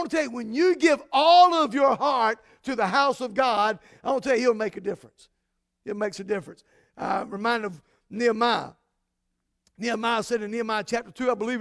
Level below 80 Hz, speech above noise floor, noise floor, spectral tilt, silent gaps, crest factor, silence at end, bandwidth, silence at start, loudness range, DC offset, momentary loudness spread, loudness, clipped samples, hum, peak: -66 dBFS; 54 dB; -78 dBFS; -4 dB/octave; none; 18 dB; 0 s; 11 kHz; 0 s; 9 LU; under 0.1%; 13 LU; -24 LUFS; under 0.1%; none; -6 dBFS